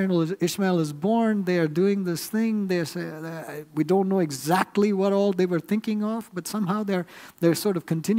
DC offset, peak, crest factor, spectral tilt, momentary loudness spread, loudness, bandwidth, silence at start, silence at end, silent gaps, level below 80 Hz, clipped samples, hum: under 0.1%; -6 dBFS; 18 dB; -6 dB/octave; 9 LU; -25 LUFS; 16 kHz; 0 s; 0 s; none; -70 dBFS; under 0.1%; none